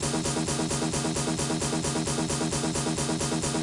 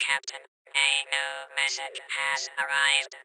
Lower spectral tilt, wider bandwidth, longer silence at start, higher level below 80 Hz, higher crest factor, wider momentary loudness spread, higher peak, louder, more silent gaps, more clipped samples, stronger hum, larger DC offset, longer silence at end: first, -4 dB/octave vs 3.5 dB/octave; second, 11.5 kHz vs 13.5 kHz; about the same, 0 s vs 0 s; first, -48 dBFS vs -86 dBFS; second, 12 dB vs 22 dB; second, 0 LU vs 10 LU; second, -16 dBFS vs -8 dBFS; about the same, -27 LUFS vs -26 LUFS; second, none vs 0.48-0.65 s; neither; neither; neither; about the same, 0 s vs 0 s